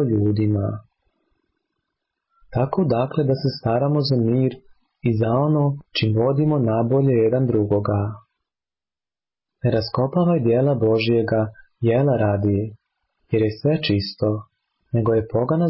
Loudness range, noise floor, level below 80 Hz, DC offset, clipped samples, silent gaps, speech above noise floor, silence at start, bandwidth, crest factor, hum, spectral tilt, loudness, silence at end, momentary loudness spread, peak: 3 LU; under -90 dBFS; -48 dBFS; under 0.1%; under 0.1%; none; over 71 dB; 0 s; 5.8 kHz; 12 dB; none; -12 dB/octave; -21 LUFS; 0 s; 7 LU; -10 dBFS